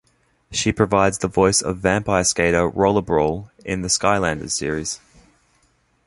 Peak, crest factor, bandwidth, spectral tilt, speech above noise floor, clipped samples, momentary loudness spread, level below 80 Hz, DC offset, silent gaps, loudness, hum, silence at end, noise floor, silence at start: -2 dBFS; 18 dB; 11.5 kHz; -4 dB/octave; 43 dB; under 0.1%; 9 LU; -42 dBFS; under 0.1%; none; -19 LUFS; none; 1.1 s; -62 dBFS; 0.5 s